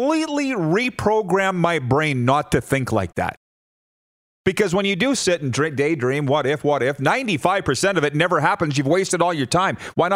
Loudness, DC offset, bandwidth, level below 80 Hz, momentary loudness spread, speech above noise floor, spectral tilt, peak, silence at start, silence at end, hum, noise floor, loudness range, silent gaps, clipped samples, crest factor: -20 LUFS; under 0.1%; 16 kHz; -50 dBFS; 4 LU; over 70 dB; -5 dB/octave; -2 dBFS; 0 s; 0 s; none; under -90 dBFS; 3 LU; 3.37-4.44 s; under 0.1%; 18 dB